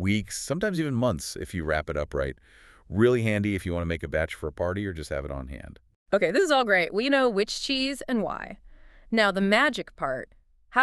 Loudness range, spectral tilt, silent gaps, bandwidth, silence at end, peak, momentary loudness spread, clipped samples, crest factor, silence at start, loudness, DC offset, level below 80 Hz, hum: 3 LU; -5 dB/octave; 5.96-6.06 s; 13.5 kHz; 0 s; -6 dBFS; 12 LU; under 0.1%; 20 dB; 0 s; -26 LUFS; under 0.1%; -46 dBFS; none